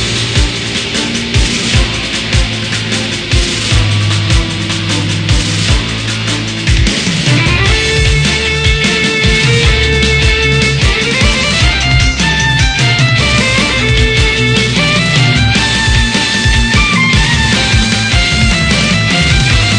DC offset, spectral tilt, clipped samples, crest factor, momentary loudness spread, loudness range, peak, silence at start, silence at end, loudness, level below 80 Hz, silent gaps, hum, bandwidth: 0.2%; -4 dB/octave; under 0.1%; 10 dB; 5 LU; 3 LU; 0 dBFS; 0 s; 0 s; -10 LUFS; -18 dBFS; none; none; 10 kHz